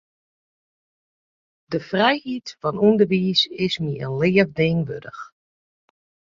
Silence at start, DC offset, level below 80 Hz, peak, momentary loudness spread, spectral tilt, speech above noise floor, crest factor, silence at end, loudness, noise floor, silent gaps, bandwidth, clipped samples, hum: 1.7 s; under 0.1%; -58 dBFS; -4 dBFS; 13 LU; -6.5 dB/octave; over 69 dB; 20 dB; 1.1 s; -21 LUFS; under -90 dBFS; none; 7.4 kHz; under 0.1%; none